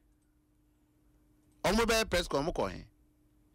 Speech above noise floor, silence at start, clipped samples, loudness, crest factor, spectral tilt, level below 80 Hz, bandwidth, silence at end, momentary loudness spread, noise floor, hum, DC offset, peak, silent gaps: 39 dB; 1.65 s; under 0.1%; -31 LUFS; 18 dB; -3.5 dB/octave; -48 dBFS; 16 kHz; 0.7 s; 10 LU; -70 dBFS; none; under 0.1%; -18 dBFS; none